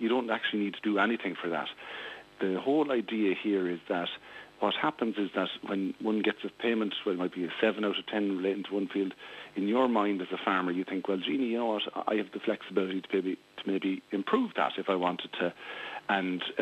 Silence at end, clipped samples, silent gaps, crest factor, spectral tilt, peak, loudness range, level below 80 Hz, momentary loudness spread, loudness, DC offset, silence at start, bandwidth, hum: 0 s; under 0.1%; none; 18 dB; -6.5 dB/octave; -12 dBFS; 1 LU; -78 dBFS; 7 LU; -31 LUFS; under 0.1%; 0 s; 8.4 kHz; none